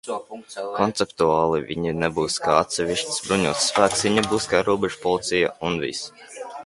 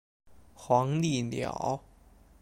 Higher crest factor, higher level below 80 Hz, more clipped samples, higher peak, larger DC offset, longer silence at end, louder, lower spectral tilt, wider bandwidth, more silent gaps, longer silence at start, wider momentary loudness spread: about the same, 22 dB vs 20 dB; first, -52 dBFS vs -58 dBFS; neither; first, -2 dBFS vs -12 dBFS; neither; second, 0 s vs 0.65 s; first, -22 LUFS vs -30 LUFS; second, -3.5 dB/octave vs -6 dB/octave; second, 11.5 kHz vs 13.5 kHz; neither; second, 0.05 s vs 0.6 s; first, 13 LU vs 10 LU